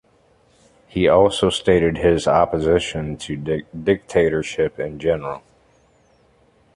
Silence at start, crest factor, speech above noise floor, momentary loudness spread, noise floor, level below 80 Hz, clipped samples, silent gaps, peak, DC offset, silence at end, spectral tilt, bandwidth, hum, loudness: 0.95 s; 18 dB; 39 dB; 12 LU; -57 dBFS; -42 dBFS; under 0.1%; none; -2 dBFS; under 0.1%; 1.35 s; -5.5 dB/octave; 11.5 kHz; none; -19 LUFS